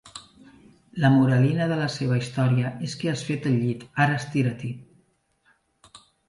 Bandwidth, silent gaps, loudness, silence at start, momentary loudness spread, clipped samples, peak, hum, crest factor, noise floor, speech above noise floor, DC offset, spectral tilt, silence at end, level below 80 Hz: 11.5 kHz; none; -24 LUFS; 0.05 s; 16 LU; under 0.1%; -6 dBFS; none; 18 dB; -66 dBFS; 43 dB; under 0.1%; -7 dB/octave; 0.3 s; -62 dBFS